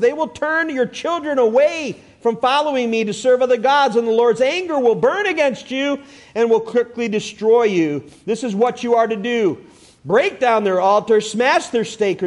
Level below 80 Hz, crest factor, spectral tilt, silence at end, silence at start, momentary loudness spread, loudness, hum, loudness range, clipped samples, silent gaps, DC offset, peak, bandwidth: -62 dBFS; 14 dB; -4.5 dB/octave; 0 s; 0 s; 8 LU; -17 LUFS; none; 2 LU; under 0.1%; none; under 0.1%; -4 dBFS; 11 kHz